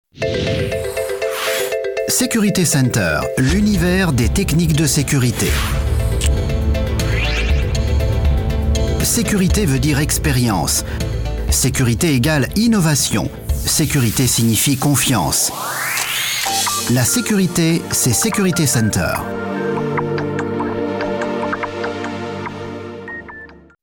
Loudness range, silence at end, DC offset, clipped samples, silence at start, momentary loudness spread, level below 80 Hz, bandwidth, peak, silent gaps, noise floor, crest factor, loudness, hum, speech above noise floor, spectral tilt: 5 LU; 0.3 s; under 0.1%; under 0.1%; 0.15 s; 8 LU; -24 dBFS; 19.5 kHz; -4 dBFS; none; -38 dBFS; 12 dB; -17 LUFS; none; 23 dB; -4.5 dB/octave